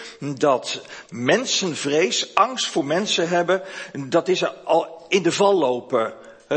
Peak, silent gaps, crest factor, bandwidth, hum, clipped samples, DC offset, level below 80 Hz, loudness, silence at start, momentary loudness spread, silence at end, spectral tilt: 0 dBFS; none; 20 dB; 8.8 kHz; none; under 0.1%; under 0.1%; -70 dBFS; -21 LUFS; 0 s; 11 LU; 0 s; -3.5 dB/octave